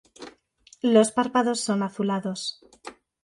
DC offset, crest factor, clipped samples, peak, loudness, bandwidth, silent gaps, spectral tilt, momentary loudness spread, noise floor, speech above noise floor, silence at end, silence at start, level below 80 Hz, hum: under 0.1%; 20 dB; under 0.1%; -6 dBFS; -24 LUFS; 11.5 kHz; none; -4.5 dB/octave; 25 LU; -57 dBFS; 34 dB; 0.3 s; 0.2 s; -70 dBFS; none